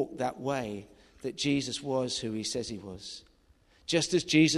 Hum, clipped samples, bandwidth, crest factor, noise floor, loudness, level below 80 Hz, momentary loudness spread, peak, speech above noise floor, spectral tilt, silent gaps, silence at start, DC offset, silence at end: none; under 0.1%; 12.5 kHz; 20 dB; -64 dBFS; -31 LUFS; -62 dBFS; 16 LU; -10 dBFS; 33 dB; -4 dB/octave; none; 0 s; under 0.1%; 0 s